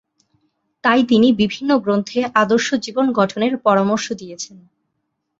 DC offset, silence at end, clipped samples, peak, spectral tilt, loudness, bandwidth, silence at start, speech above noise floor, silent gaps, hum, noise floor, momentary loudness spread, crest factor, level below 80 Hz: under 0.1%; 0.95 s; under 0.1%; -2 dBFS; -5 dB/octave; -17 LUFS; 7.8 kHz; 0.85 s; 57 dB; none; none; -73 dBFS; 13 LU; 16 dB; -58 dBFS